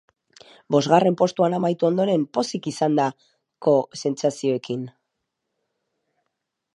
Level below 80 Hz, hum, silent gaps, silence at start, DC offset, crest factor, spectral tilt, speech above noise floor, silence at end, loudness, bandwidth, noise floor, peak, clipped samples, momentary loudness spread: -72 dBFS; none; none; 0.7 s; under 0.1%; 22 dB; -6 dB/octave; 58 dB; 1.85 s; -22 LUFS; 11.5 kHz; -79 dBFS; -2 dBFS; under 0.1%; 9 LU